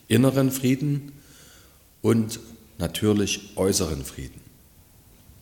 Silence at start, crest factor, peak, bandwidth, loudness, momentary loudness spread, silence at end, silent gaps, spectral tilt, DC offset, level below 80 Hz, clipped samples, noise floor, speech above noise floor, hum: 0.1 s; 20 dB; -4 dBFS; 17.5 kHz; -24 LUFS; 17 LU; 1.05 s; none; -5.5 dB/octave; under 0.1%; -48 dBFS; under 0.1%; -53 dBFS; 30 dB; none